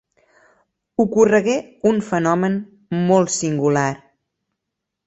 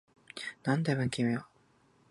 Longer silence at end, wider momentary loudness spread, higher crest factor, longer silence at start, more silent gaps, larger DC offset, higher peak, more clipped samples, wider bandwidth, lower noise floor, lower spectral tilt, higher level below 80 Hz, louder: first, 1.1 s vs 0.65 s; about the same, 11 LU vs 12 LU; about the same, 18 dB vs 20 dB; first, 1 s vs 0.35 s; neither; neither; first, -2 dBFS vs -14 dBFS; neither; second, 8.2 kHz vs 11.5 kHz; first, -81 dBFS vs -67 dBFS; about the same, -5.5 dB/octave vs -6 dB/octave; first, -58 dBFS vs -68 dBFS; first, -19 LUFS vs -33 LUFS